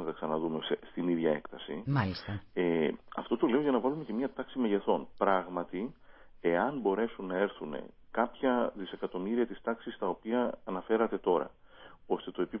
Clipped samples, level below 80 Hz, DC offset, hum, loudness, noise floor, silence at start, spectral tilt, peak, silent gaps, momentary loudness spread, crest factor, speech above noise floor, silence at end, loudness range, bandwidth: under 0.1%; -62 dBFS; under 0.1%; none; -33 LUFS; -54 dBFS; 0 s; -10 dB/octave; -12 dBFS; none; 10 LU; 20 dB; 22 dB; 0 s; 2 LU; 5.8 kHz